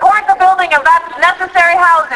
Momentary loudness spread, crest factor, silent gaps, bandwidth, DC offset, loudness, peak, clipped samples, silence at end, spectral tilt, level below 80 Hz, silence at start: 3 LU; 10 dB; none; 11 kHz; under 0.1%; -9 LUFS; 0 dBFS; 0.1%; 0 s; -1.5 dB/octave; -48 dBFS; 0 s